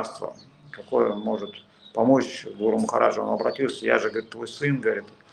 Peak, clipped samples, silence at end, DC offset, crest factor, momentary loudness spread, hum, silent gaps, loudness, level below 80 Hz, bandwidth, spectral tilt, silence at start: -2 dBFS; under 0.1%; 0.25 s; under 0.1%; 22 dB; 16 LU; none; none; -25 LUFS; -70 dBFS; 10.5 kHz; -5.5 dB/octave; 0 s